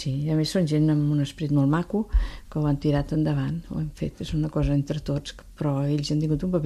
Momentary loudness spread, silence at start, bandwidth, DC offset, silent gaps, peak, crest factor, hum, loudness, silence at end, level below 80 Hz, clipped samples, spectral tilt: 8 LU; 0 s; 12 kHz; under 0.1%; none; -10 dBFS; 14 dB; none; -25 LUFS; 0 s; -36 dBFS; under 0.1%; -7.5 dB/octave